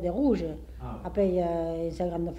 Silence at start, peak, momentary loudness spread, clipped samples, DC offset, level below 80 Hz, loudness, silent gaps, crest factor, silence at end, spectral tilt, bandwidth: 0 s; -14 dBFS; 12 LU; under 0.1%; under 0.1%; -42 dBFS; -29 LUFS; none; 14 dB; 0 s; -9 dB/octave; 12.5 kHz